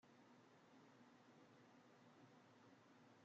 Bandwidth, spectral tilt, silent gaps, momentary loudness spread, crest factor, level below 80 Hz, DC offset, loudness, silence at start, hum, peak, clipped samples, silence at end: 7.4 kHz; -4.5 dB/octave; none; 1 LU; 12 dB; under -90 dBFS; under 0.1%; -70 LUFS; 0 s; none; -58 dBFS; under 0.1%; 0 s